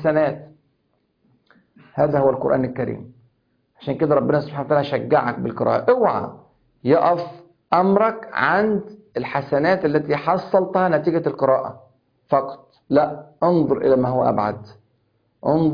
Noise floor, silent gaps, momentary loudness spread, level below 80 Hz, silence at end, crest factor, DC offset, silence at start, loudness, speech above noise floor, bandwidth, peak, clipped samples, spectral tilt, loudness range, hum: -68 dBFS; none; 12 LU; -56 dBFS; 0 s; 18 dB; under 0.1%; 0 s; -20 LUFS; 49 dB; 5.2 kHz; -2 dBFS; under 0.1%; -9.5 dB/octave; 3 LU; none